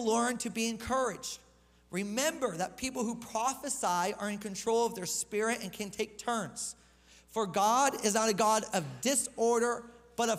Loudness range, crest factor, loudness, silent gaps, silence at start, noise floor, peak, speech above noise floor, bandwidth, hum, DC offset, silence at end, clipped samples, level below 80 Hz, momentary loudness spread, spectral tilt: 5 LU; 18 dB; -32 LUFS; none; 0 s; -60 dBFS; -14 dBFS; 28 dB; 16 kHz; none; under 0.1%; 0 s; under 0.1%; -64 dBFS; 11 LU; -3 dB/octave